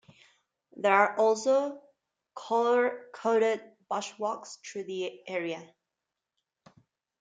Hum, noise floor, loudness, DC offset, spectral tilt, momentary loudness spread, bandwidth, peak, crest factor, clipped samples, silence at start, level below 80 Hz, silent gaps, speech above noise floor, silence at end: none; -88 dBFS; -29 LUFS; under 0.1%; -3.5 dB/octave; 16 LU; 9.4 kHz; -8 dBFS; 22 dB; under 0.1%; 0.75 s; -86 dBFS; none; 59 dB; 1.55 s